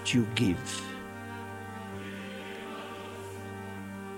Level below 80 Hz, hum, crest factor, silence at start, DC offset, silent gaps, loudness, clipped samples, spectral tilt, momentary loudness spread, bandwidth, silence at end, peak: -64 dBFS; none; 24 dB; 0 s; under 0.1%; none; -36 LUFS; under 0.1%; -4.5 dB/octave; 13 LU; 16 kHz; 0 s; -10 dBFS